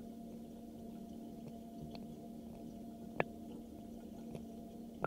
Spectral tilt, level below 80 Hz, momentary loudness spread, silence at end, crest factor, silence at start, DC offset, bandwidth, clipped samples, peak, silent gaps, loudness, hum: -6.5 dB/octave; -66 dBFS; 9 LU; 0 s; 34 dB; 0 s; under 0.1%; 16 kHz; under 0.1%; -14 dBFS; none; -49 LUFS; none